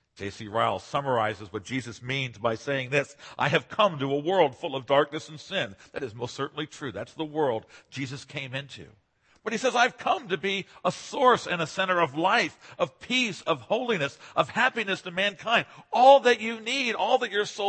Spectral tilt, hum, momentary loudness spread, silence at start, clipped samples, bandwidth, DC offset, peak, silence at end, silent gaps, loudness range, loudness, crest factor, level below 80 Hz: -4 dB/octave; none; 12 LU; 0.2 s; under 0.1%; 8.8 kHz; under 0.1%; -4 dBFS; 0 s; none; 9 LU; -26 LUFS; 22 dB; -68 dBFS